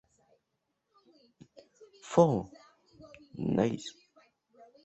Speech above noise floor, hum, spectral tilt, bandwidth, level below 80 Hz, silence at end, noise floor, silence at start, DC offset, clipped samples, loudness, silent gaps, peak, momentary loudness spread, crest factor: 54 dB; none; -7 dB/octave; 8.2 kHz; -66 dBFS; 0.95 s; -82 dBFS; 2.05 s; under 0.1%; under 0.1%; -30 LUFS; none; -8 dBFS; 23 LU; 26 dB